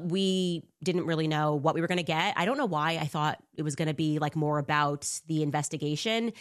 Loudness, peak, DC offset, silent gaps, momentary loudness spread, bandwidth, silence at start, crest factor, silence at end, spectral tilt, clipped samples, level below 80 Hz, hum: -29 LUFS; -12 dBFS; under 0.1%; none; 5 LU; 13 kHz; 0 s; 18 dB; 0 s; -5 dB/octave; under 0.1%; -70 dBFS; none